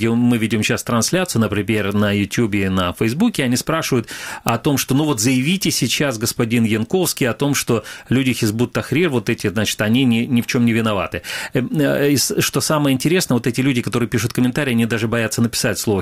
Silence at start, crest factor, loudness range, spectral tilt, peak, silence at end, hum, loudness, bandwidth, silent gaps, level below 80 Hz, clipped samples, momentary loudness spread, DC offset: 0 s; 18 dB; 1 LU; -4.5 dB/octave; 0 dBFS; 0 s; none; -18 LUFS; 16.5 kHz; none; -48 dBFS; under 0.1%; 4 LU; 0.2%